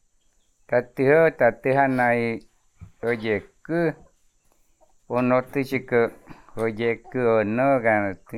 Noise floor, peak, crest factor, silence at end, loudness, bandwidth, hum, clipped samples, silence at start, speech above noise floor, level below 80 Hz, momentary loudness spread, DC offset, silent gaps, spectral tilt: -63 dBFS; -6 dBFS; 18 dB; 0 s; -23 LUFS; 14.5 kHz; none; under 0.1%; 0.7 s; 41 dB; -56 dBFS; 9 LU; under 0.1%; none; -8 dB/octave